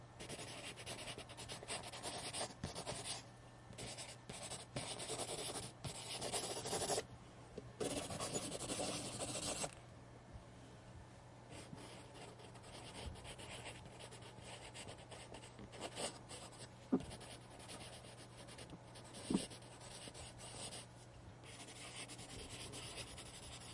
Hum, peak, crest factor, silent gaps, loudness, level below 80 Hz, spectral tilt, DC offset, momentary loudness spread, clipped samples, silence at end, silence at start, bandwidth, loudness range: none; -24 dBFS; 26 dB; none; -47 LUFS; -66 dBFS; -3 dB/octave; under 0.1%; 14 LU; under 0.1%; 0 s; 0 s; 11.5 kHz; 9 LU